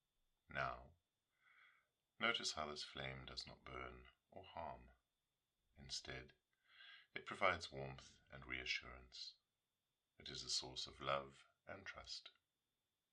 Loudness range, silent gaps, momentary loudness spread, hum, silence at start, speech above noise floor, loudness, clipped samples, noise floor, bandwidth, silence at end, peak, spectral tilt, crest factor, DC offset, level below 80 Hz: 7 LU; none; 21 LU; none; 0.5 s; over 41 dB; -47 LUFS; under 0.1%; under -90 dBFS; 11 kHz; 0.85 s; -22 dBFS; -2.5 dB/octave; 28 dB; under 0.1%; -70 dBFS